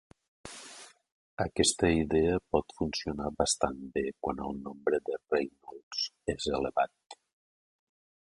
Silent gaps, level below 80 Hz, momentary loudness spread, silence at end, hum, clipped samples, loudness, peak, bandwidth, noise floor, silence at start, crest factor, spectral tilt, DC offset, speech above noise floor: 1.12-1.37 s, 5.83-5.91 s; -50 dBFS; 19 LU; 1.25 s; none; under 0.1%; -31 LUFS; -10 dBFS; 11.5 kHz; -52 dBFS; 0.45 s; 24 dB; -4 dB/octave; under 0.1%; 21 dB